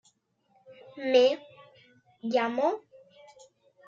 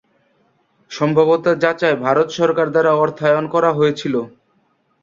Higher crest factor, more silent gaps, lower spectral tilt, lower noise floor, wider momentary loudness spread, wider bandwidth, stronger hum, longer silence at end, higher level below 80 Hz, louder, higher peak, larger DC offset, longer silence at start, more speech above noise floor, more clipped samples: about the same, 20 dB vs 16 dB; neither; second, -4 dB/octave vs -6.5 dB/octave; first, -69 dBFS vs -62 dBFS; first, 17 LU vs 7 LU; about the same, 7.4 kHz vs 7.4 kHz; neither; first, 1.1 s vs 0.75 s; second, -84 dBFS vs -62 dBFS; second, -27 LUFS vs -16 LUFS; second, -12 dBFS vs -2 dBFS; neither; second, 0.7 s vs 0.9 s; about the same, 44 dB vs 46 dB; neither